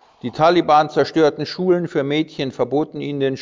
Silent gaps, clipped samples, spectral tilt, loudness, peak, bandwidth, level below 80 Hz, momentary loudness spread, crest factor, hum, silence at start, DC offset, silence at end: none; under 0.1%; -6.5 dB/octave; -18 LUFS; -2 dBFS; 7.6 kHz; -60 dBFS; 8 LU; 16 dB; none; 0.25 s; under 0.1%; 0 s